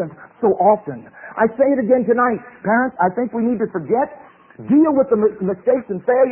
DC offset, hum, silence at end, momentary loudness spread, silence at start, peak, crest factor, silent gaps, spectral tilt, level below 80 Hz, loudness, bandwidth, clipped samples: under 0.1%; none; 0 s; 10 LU; 0 s; -4 dBFS; 14 dB; none; -13.5 dB/octave; -58 dBFS; -18 LUFS; 3 kHz; under 0.1%